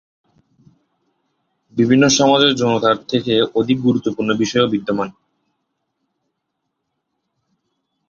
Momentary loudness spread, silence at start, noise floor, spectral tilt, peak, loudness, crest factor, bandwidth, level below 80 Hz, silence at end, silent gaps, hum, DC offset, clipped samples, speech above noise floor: 9 LU; 1.75 s; -75 dBFS; -4.5 dB/octave; 0 dBFS; -16 LUFS; 18 dB; 7.6 kHz; -56 dBFS; 3 s; none; none; under 0.1%; under 0.1%; 60 dB